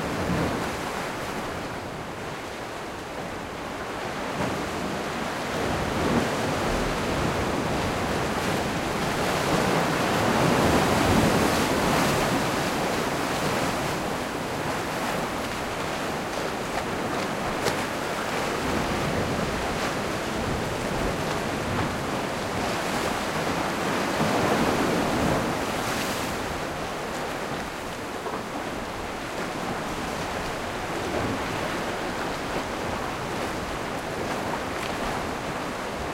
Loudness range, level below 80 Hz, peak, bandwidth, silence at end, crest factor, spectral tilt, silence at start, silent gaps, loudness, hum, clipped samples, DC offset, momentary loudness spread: 8 LU; -44 dBFS; -8 dBFS; 16 kHz; 0 s; 20 dB; -4.5 dB/octave; 0 s; none; -27 LUFS; none; under 0.1%; under 0.1%; 9 LU